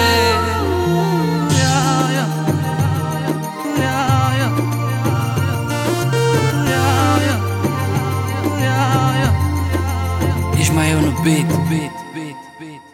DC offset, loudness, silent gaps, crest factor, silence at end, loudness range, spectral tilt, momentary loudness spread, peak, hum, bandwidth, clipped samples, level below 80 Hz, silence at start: under 0.1%; -17 LUFS; none; 14 dB; 0.1 s; 2 LU; -5.5 dB/octave; 6 LU; -2 dBFS; none; 17 kHz; under 0.1%; -36 dBFS; 0 s